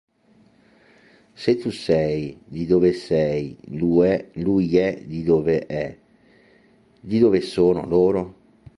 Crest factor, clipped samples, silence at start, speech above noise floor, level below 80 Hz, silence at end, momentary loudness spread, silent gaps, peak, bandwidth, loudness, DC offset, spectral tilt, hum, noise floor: 18 dB; under 0.1%; 1.4 s; 37 dB; -50 dBFS; 0.45 s; 10 LU; none; -4 dBFS; 11.5 kHz; -21 LUFS; under 0.1%; -8 dB/octave; none; -57 dBFS